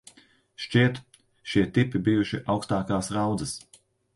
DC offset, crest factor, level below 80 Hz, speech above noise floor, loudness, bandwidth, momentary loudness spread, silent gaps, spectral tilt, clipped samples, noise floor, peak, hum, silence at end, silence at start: under 0.1%; 20 dB; -54 dBFS; 33 dB; -26 LUFS; 11.5 kHz; 15 LU; none; -6 dB/octave; under 0.1%; -58 dBFS; -8 dBFS; none; 0.6 s; 0.6 s